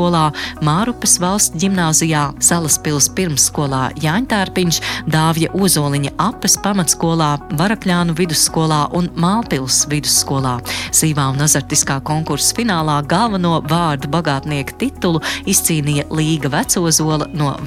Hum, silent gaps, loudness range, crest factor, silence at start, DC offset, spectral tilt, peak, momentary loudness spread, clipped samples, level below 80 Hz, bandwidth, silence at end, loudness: none; none; 3 LU; 16 dB; 0 s; under 0.1%; -3.5 dB/octave; 0 dBFS; 5 LU; under 0.1%; -38 dBFS; 16.5 kHz; 0 s; -15 LUFS